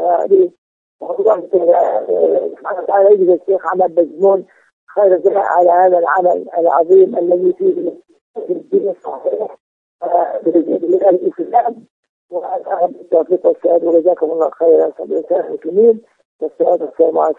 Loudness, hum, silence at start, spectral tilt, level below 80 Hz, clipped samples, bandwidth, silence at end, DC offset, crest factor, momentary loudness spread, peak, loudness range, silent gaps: -14 LUFS; none; 0 s; -9 dB/octave; -72 dBFS; under 0.1%; 3.7 kHz; 0.05 s; under 0.1%; 14 dB; 12 LU; 0 dBFS; 4 LU; 0.58-0.99 s, 4.73-4.87 s, 8.21-8.34 s, 9.60-9.99 s, 11.90-12.03 s, 12.09-12.29 s, 16.25-16.39 s